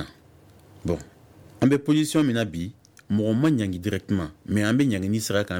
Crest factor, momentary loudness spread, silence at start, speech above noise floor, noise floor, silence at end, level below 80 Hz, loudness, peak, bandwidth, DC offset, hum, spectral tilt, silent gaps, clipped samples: 18 dB; 10 LU; 0 s; 29 dB; -53 dBFS; 0 s; -52 dBFS; -24 LUFS; -6 dBFS; 18 kHz; under 0.1%; none; -6 dB/octave; none; under 0.1%